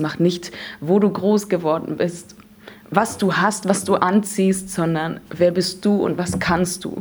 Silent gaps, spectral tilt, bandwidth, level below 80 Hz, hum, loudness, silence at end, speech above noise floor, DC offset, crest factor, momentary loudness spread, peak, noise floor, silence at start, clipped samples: none; -5.5 dB/octave; over 20 kHz; -50 dBFS; none; -20 LUFS; 0 s; 24 dB; under 0.1%; 20 dB; 7 LU; 0 dBFS; -43 dBFS; 0 s; under 0.1%